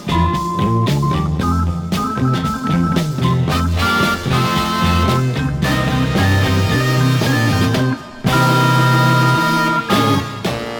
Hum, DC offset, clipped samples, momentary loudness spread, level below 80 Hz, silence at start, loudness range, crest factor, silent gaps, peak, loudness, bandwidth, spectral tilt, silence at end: none; under 0.1%; under 0.1%; 6 LU; -34 dBFS; 0 s; 3 LU; 14 dB; none; -2 dBFS; -16 LUFS; over 20 kHz; -6 dB/octave; 0 s